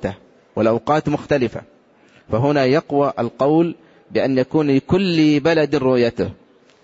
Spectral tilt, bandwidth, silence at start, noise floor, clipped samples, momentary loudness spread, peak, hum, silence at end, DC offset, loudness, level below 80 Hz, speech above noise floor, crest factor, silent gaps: -7.5 dB/octave; 7.8 kHz; 0 s; -52 dBFS; under 0.1%; 9 LU; -6 dBFS; none; 0.5 s; under 0.1%; -18 LUFS; -50 dBFS; 35 dB; 14 dB; none